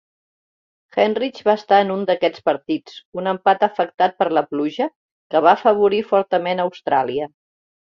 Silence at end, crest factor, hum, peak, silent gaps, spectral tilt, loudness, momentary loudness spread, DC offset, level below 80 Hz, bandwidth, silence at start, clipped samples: 0.65 s; 18 dB; none; -2 dBFS; 3.05-3.12 s, 3.94-3.98 s, 4.96-5.30 s; -6.5 dB/octave; -19 LUFS; 11 LU; under 0.1%; -66 dBFS; 7 kHz; 0.95 s; under 0.1%